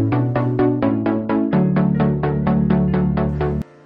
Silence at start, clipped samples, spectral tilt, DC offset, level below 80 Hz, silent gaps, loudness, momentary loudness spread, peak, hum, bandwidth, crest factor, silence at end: 0 s; under 0.1%; -11 dB/octave; under 0.1%; -34 dBFS; none; -18 LUFS; 3 LU; -6 dBFS; none; 5.2 kHz; 12 dB; 0.25 s